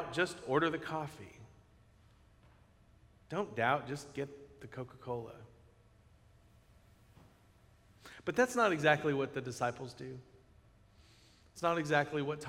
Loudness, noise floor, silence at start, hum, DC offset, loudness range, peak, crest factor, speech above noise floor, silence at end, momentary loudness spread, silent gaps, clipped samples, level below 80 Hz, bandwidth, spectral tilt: -35 LUFS; -65 dBFS; 0 s; none; under 0.1%; 15 LU; -12 dBFS; 26 dB; 30 dB; 0 s; 22 LU; none; under 0.1%; -68 dBFS; 16 kHz; -5 dB/octave